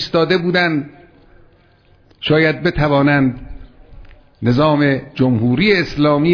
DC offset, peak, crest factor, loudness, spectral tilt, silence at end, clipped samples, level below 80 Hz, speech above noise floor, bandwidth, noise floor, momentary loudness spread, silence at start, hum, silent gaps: under 0.1%; -2 dBFS; 14 dB; -15 LUFS; -7.5 dB/octave; 0 s; under 0.1%; -38 dBFS; 37 dB; 5.4 kHz; -51 dBFS; 8 LU; 0 s; none; none